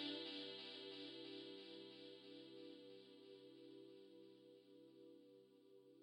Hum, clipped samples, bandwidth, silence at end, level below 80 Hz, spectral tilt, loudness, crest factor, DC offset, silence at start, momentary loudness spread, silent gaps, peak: none; under 0.1%; 16 kHz; 0 s; under -90 dBFS; -4.5 dB/octave; -57 LUFS; 20 dB; under 0.1%; 0 s; 16 LU; none; -36 dBFS